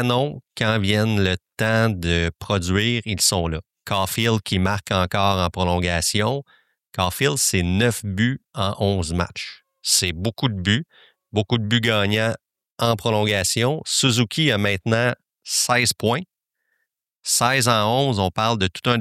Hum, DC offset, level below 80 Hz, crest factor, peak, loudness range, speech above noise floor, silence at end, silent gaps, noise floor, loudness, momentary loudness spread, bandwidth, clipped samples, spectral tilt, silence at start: none; under 0.1%; -48 dBFS; 18 dB; -4 dBFS; 2 LU; 55 dB; 0 s; 12.72-12.76 s; -76 dBFS; -21 LUFS; 8 LU; 15.5 kHz; under 0.1%; -4 dB/octave; 0 s